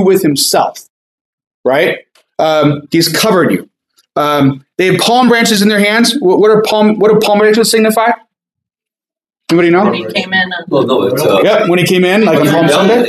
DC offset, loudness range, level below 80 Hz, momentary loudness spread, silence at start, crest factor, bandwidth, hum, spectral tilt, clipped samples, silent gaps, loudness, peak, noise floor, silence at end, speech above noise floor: under 0.1%; 4 LU; -56 dBFS; 7 LU; 0 s; 10 dB; 15.5 kHz; none; -4.5 dB/octave; under 0.1%; 0.90-1.38 s, 1.47-1.64 s; -10 LUFS; 0 dBFS; under -90 dBFS; 0 s; over 81 dB